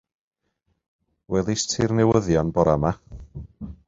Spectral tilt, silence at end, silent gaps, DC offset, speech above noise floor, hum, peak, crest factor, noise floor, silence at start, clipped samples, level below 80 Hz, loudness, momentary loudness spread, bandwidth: -5.5 dB/octave; 0.15 s; none; under 0.1%; 51 dB; none; -4 dBFS; 20 dB; -73 dBFS; 1.3 s; under 0.1%; -42 dBFS; -22 LUFS; 21 LU; 8 kHz